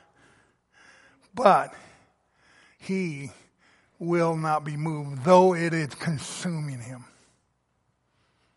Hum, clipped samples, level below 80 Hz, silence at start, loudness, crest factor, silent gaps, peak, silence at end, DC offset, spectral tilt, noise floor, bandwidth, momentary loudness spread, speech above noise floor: none; under 0.1%; -70 dBFS; 1.35 s; -25 LUFS; 24 dB; none; -4 dBFS; 1.55 s; under 0.1%; -6 dB/octave; -72 dBFS; 11.5 kHz; 21 LU; 48 dB